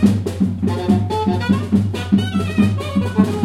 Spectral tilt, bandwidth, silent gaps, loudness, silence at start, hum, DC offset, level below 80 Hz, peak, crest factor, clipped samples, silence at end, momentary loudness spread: -7.5 dB/octave; 12.5 kHz; none; -18 LUFS; 0 s; none; under 0.1%; -46 dBFS; 0 dBFS; 16 dB; under 0.1%; 0 s; 3 LU